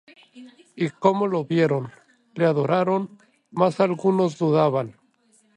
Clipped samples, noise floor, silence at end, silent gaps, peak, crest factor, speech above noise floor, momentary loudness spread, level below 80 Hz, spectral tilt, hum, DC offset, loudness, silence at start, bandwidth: under 0.1%; -62 dBFS; 0.65 s; none; -4 dBFS; 20 dB; 40 dB; 14 LU; -70 dBFS; -7.5 dB/octave; none; under 0.1%; -22 LUFS; 0.35 s; 10 kHz